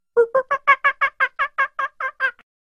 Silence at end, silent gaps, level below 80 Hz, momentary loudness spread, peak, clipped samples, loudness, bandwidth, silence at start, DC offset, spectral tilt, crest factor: 0.35 s; none; -64 dBFS; 8 LU; -2 dBFS; under 0.1%; -20 LUFS; 10.5 kHz; 0.15 s; under 0.1%; -2.5 dB/octave; 18 dB